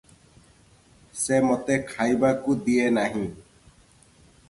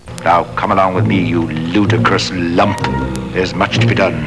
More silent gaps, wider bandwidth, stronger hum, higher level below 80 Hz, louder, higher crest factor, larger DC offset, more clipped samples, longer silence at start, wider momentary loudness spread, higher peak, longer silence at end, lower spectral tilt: neither; about the same, 11.5 kHz vs 11 kHz; neither; second, -58 dBFS vs -34 dBFS; second, -24 LUFS vs -14 LUFS; about the same, 18 dB vs 14 dB; second, under 0.1% vs 0.6%; neither; first, 1.15 s vs 0.05 s; first, 9 LU vs 6 LU; second, -8 dBFS vs 0 dBFS; first, 1.1 s vs 0 s; about the same, -5 dB/octave vs -6 dB/octave